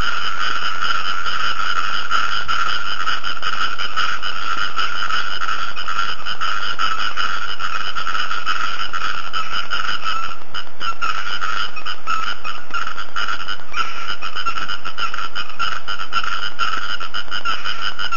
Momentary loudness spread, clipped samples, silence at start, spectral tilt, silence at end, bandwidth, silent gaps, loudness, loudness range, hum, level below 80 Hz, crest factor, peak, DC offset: 5 LU; under 0.1%; 0 s; -2 dB/octave; 0 s; 7.2 kHz; none; -22 LUFS; 4 LU; none; -50 dBFS; 18 dB; -2 dBFS; 30%